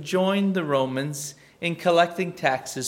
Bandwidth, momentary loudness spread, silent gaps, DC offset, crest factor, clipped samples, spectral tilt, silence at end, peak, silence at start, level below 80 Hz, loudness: 16.5 kHz; 10 LU; none; under 0.1%; 20 dB; under 0.1%; -4.5 dB/octave; 0 s; -4 dBFS; 0 s; -70 dBFS; -24 LUFS